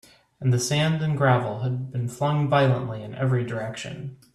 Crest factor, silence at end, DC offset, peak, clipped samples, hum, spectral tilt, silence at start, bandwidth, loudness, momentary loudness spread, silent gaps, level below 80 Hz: 18 dB; 0.2 s; under 0.1%; -8 dBFS; under 0.1%; none; -6 dB/octave; 0.4 s; 13 kHz; -24 LUFS; 12 LU; none; -58 dBFS